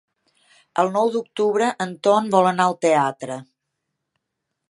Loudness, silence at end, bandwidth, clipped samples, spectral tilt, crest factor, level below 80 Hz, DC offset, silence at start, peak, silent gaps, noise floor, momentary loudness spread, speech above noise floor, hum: -20 LUFS; 1.25 s; 11.5 kHz; under 0.1%; -5 dB/octave; 20 dB; -74 dBFS; under 0.1%; 0.75 s; -2 dBFS; none; -79 dBFS; 12 LU; 60 dB; none